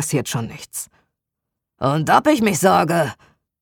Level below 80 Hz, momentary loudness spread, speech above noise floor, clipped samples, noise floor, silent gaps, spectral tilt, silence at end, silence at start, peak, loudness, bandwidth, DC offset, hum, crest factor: -56 dBFS; 15 LU; 64 dB; under 0.1%; -82 dBFS; none; -5 dB/octave; 0.5 s; 0 s; -2 dBFS; -18 LUFS; 19.5 kHz; under 0.1%; none; 18 dB